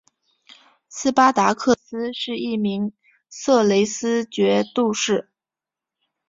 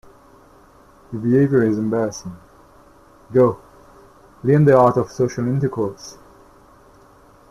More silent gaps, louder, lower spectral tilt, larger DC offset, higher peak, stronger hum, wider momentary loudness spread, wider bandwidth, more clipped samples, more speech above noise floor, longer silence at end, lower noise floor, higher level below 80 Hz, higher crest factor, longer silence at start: neither; about the same, -20 LUFS vs -18 LUFS; second, -4 dB/octave vs -8 dB/octave; neither; about the same, -2 dBFS vs -2 dBFS; neither; second, 12 LU vs 20 LU; second, 7.8 kHz vs 12.5 kHz; neither; first, 69 dB vs 32 dB; second, 1.05 s vs 1.4 s; first, -89 dBFS vs -49 dBFS; second, -64 dBFS vs -54 dBFS; about the same, 20 dB vs 18 dB; second, 0.9 s vs 1.1 s